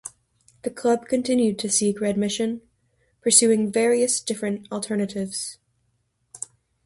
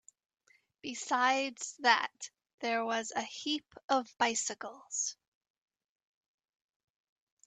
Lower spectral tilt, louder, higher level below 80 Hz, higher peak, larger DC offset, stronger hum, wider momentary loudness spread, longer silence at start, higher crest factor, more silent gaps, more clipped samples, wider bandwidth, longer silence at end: first, -3.5 dB/octave vs -0.5 dB/octave; first, -22 LUFS vs -33 LUFS; first, -64 dBFS vs -84 dBFS; first, -2 dBFS vs -10 dBFS; neither; neither; first, 19 LU vs 14 LU; second, 0.05 s vs 0.85 s; about the same, 22 dB vs 26 dB; second, none vs 2.54-2.58 s, 3.84-3.89 s; neither; first, 12 kHz vs 9.6 kHz; second, 0.5 s vs 2.35 s